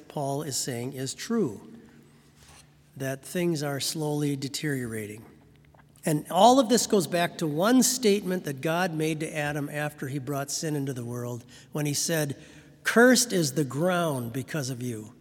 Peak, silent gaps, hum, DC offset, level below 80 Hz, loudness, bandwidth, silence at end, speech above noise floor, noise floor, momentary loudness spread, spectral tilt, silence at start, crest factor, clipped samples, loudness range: -6 dBFS; none; none; under 0.1%; -66 dBFS; -26 LUFS; 18 kHz; 0.1 s; 29 dB; -56 dBFS; 14 LU; -4 dB/octave; 0 s; 22 dB; under 0.1%; 8 LU